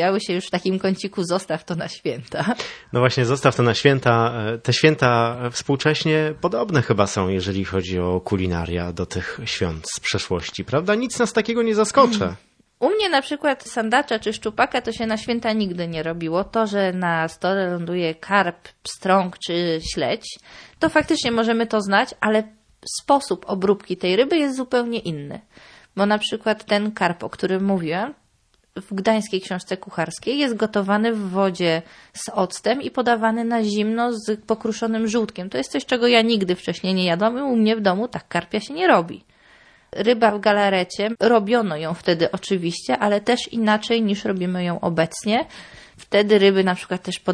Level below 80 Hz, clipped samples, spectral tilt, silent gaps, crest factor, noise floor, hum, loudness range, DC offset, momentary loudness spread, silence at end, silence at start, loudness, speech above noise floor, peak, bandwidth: -52 dBFS; under 0.1%; -5 dB/octave; none; 20 dB; -62 dBFS; none; 4 LU; under 0.1%; 10 LU; 0 s; 0 s; -21 LUFS; 41 dB; 0 dBFS; 11 kHz